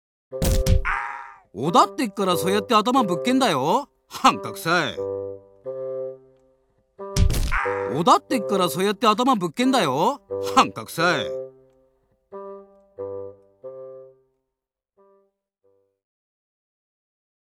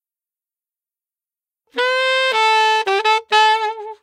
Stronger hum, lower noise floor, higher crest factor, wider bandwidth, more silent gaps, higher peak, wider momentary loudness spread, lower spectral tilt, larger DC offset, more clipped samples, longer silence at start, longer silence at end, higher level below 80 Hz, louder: neither; second, -84 dBFS vs under -90 dBFS; about the same, 20 dB vs 18 dB; first, 19.5 kHz vs 12.5 kHz; neither; second, -4 dBFS vs 0 dBFS; first, 20 LU vs 7 LU; first, -4.5 dB/octave vs 1.5 dB/octave; neither; neither; second, 0.3 s vs 1.75 s; first, 3.4 s vs 0.1 s; first, -34 dBFS vs -78 dBFS; second, -22 LUFS vs -15 LUFS